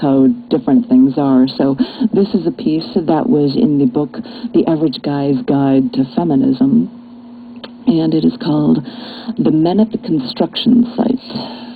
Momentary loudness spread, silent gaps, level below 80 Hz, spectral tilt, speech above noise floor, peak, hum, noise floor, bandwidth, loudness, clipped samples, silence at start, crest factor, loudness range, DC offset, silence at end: 8 LU; none; -50 dBFS; -10.5 dB/octave; 21 dB; 0 dBFS; none; -34 dBFS; 4.8 kHz; -14 LUFS; under 0.1%; 0 s; 14 dB; 2 LU; under 0.1%; 0 s